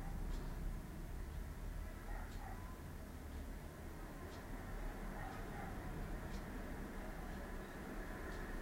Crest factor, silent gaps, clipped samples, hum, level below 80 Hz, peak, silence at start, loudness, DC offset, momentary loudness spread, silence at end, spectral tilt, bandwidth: 14 dB; none; under 0.1%; none; -48 dBFS; -34 dBFS; 0 s; -50 LUFS; under 0.1%; 4 LU; 0 s; -6 dB/octave; 16 kHz